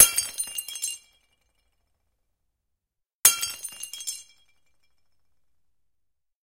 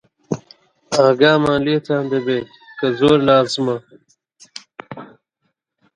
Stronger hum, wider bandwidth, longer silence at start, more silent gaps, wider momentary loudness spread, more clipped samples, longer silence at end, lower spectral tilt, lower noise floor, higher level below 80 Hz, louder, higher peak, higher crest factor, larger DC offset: neither; first, 16.5 kHz vs 11 kHz; second, 0 s vs 0.3 s; first, 3.13-3.23 s vs none; second, 16 LU vs 23 LU; neither; first, 2.2 s vs 0.9 s; second, 2.5 dB/octave vs -5.5 dB/octave; first, -83 dBFS vs -72 dBFS; second, -68 dBFS vs -54 dBFS; second, -24 LUFS vs -17 LUFS; about the same, 0 dBFS vs 0 dBFS; first, 30 dB vs 18 dB; neither